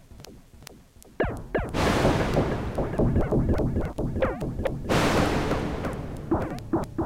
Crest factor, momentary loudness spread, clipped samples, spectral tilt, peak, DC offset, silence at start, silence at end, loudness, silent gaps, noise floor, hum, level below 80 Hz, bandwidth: 18 dB; 8 LU; under 0.1%; -6.5 dB/octave; -8 dBFS; under 0.1%; 0.1 s; 0 s; -27 LUFS; none; -50 dBFS; none; -34 dBFS; 16.5 kHz